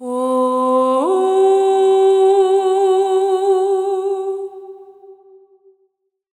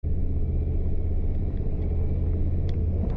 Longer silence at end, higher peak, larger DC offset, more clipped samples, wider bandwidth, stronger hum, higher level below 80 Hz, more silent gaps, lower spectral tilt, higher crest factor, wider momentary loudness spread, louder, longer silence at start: first, 1.25 s vs 0 s; first, -4 dBFS vs -16 dBFS; neither; neither; first, 10.5 kHz vs 3.7 kHz; neither; second, -76 dBFS vs -26 dBFS; neither; second, -3.5 dB/octave vs -11.5 dB/octave; about the same, 12 dB vs 8 dB; first, 9 LU vs 2 LU; first, -15 LUFS vs -28 LUFS; about the same, 0 s vs 0.05 s